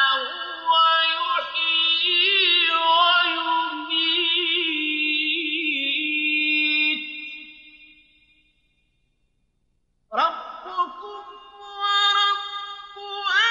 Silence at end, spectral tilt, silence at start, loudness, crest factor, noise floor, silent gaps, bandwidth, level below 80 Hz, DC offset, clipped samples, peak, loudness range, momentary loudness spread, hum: 0 s; 0 dB/octave; 0 s; -20 LUFS; 14 dB; -69 dBFS; none; 7.4 kHz; -70 dBFS; under 0.1%; under 0.1%; -8 dBFS; 12 LU; 17 LU; none